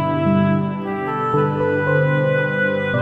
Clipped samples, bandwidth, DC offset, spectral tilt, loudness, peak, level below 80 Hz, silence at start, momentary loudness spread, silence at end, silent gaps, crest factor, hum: under 0.1%; 4.7 kHz; 0.1%; -9.5 dB/octave; -19 LUFS; -4 dBFS; -56 dBFS; 0 s; 5 LU; 0 s; none; 14 dB; 50 Hz at -40 dBFS